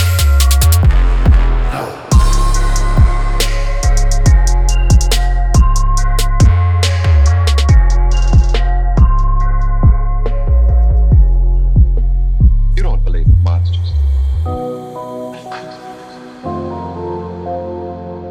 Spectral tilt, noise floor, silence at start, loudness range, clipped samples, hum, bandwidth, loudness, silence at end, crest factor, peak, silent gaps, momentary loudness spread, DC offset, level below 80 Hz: -5.5 dB/octave; -32 dBFS; 0 s; 8 LU; under 0.1%; none; 17.5 kHz; -14 LUFS; 0 s; 10 dB; -2 dBFS; none; 14 LU; under 0.1%; -12 dBFS